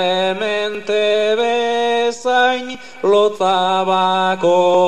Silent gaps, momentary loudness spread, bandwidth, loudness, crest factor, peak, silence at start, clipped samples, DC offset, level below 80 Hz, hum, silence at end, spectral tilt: none; 5 LU; 10.5 kHz; -16 LUFS; 12 dB; -4 dBFS; 0 s; under 0.1%; 1%; -64 dBFS; none; 0 s; -4 dB/octave